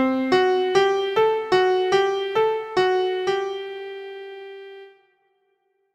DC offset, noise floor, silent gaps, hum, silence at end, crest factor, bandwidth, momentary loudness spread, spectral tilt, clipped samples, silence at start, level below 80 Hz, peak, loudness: under 0.1%; -69 dBFS; none; none; 1.05 s; 16 dB; 9.2 kHz; 18 LU; -4.5 dB/octave; under 0.1%; 0 s; -64 dBFS; -6 dBFS; -21 LUFS